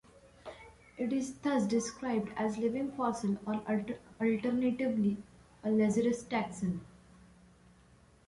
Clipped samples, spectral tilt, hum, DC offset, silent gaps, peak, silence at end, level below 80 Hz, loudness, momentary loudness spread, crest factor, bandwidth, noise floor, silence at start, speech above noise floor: under 0.1%; -6 dB/octave; none; under 0.1%; none; -20 dBFS; 1.4 s; -64 dBFS; -33 LUFS; 13 LU; 14 dB; 11.5 kHz; -62 dBFS; 0.45 s; 30 dB